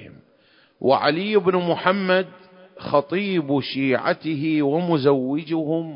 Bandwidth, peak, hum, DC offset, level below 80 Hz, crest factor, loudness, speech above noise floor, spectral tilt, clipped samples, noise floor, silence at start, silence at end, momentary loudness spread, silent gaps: 5.4 kHz; -2 dBFS; none; under 0.1%; -66 dBFS; 20 dB; -21 LUFS; 37 dB; -11 dB/octave; under 0.1%; -57 dBFS; 0 s; 0 s; 5 LU; none